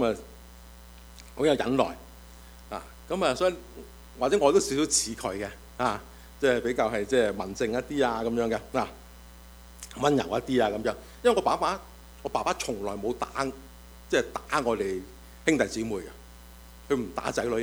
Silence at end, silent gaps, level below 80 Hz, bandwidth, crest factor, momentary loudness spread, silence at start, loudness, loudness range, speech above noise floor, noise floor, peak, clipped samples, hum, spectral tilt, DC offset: 0 s; none; -50 dBFS; over 20 kHz; 20 dB; 22 LU; 0 s; -28 LUFS; 4 LU; 21 dB; -48 dBFS; -8 dBFS; under 0.1%; 60 Hz at -50 dBFS; -4 dB/octave; under 0.1%